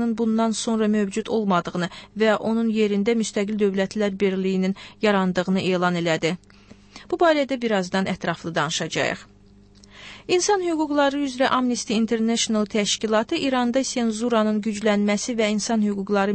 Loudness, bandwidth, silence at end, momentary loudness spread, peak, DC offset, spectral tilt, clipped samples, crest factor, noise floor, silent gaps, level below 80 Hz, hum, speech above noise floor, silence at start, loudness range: -22 LUFS; 8.8 kHz; 0 s; 5 LU; -8 dBFS; under 0.1%; -4.5 dB/octave; under 0.1%; 14 dB; -51 dBFS; none; -56 dBFS; 50 Hz at -50 dBFS; 29 dB; 0 s; 2 LU